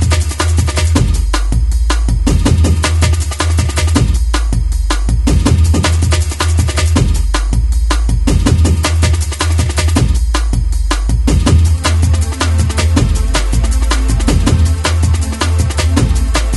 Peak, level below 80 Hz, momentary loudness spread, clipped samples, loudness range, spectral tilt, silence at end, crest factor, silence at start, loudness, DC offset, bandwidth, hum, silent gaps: 0 dBFS; -14 dBFS; 4 LU; under 0.1%; 0 LU; -5 dB/octave; 0 s; 10 dB; 0 s; -13 LUFS; under 0.1%; 12 kHz; none; none